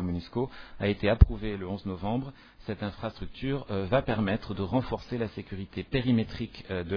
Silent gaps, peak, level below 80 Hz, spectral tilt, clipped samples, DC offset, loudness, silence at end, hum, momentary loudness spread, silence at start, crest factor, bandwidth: none; -2 dBFS; -36 dBFS; -9 dB/octave; under 0.1%; under 0.1%; -31 LUFS; 0 s; none; 13 LU; 0 s; 28 dB; 5.4 kHz